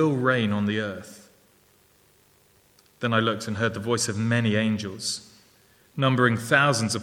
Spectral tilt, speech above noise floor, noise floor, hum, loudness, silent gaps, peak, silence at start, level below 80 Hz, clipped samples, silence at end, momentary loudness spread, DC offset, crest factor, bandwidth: -4.5 dB/octave; 36 dB; -60 dBFS; none; -24 LUFS; none; -4 dBFS; 0 s; -66 dBFS; under 0.1%; 0 s; 12 LU; under 0.1%; 22 dB; 16.5 kHz